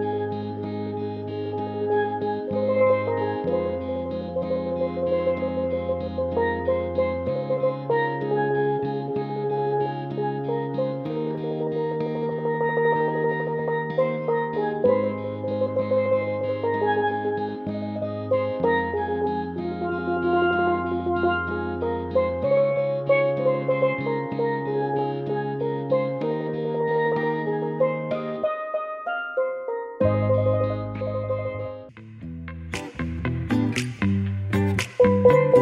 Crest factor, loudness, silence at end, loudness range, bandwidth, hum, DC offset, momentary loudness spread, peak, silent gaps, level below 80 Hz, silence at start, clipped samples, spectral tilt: 20 dB; -25 LUFS; 0 s; 3 LU; 11 kHz; none; under 0.1%; 8 LU; -4 dBFS; none; -50 dBFS; 0 s; under 0.1%; -7.5 dB/octave